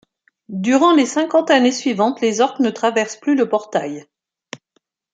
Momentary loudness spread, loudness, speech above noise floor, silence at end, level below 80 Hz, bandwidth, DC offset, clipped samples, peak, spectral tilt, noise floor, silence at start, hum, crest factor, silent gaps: 20 LU; -17 LUFS; 50 dB; 0.55 s; -70 dBFS; 9.2 kHz; under 0.1%; under 0.1%; -2 dBFS; -4 dB/octave; -67 dBFS; 0.5 s; none; 16 dB; none